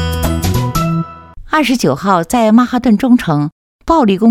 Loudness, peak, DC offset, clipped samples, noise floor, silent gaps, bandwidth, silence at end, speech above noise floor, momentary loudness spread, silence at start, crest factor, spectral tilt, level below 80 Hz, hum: -13 LUFS; 0 dBFS; under 0.1%; under 0.1%; -31 dBFS; 3.52-3.79 s; 16.5 kHz; 0 s; 21 dB; 8 LU; 0 s; 12 dB; -6 dB/octave; -30 dBFS; none